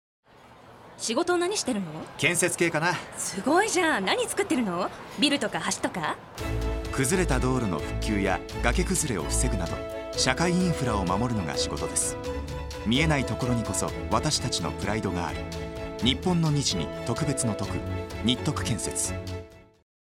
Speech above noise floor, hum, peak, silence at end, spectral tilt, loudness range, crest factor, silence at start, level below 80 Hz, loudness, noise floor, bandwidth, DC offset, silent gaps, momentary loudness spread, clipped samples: 25 dB; none; -4 dBFS; 0.45 s; -4 dB/octave; 2 LU; 22 dB; 0.45 s; -38 dBFS; -27 LUFS; -51 dBFS; 16 kHz; under 0.1%; none; 9 LU; under 0.1%